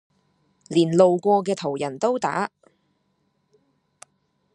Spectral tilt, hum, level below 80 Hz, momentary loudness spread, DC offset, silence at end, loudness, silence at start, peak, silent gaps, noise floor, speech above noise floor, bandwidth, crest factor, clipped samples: -6 dB/octave; none; -72 dBFS; 10 LU; under 0.1%; 2.1 s; -22 LUFS; 0.7 s; -2 dBFS; none; -70 dBFS; 49 dB; 10.5 kHz; 22 dB; under 0.1%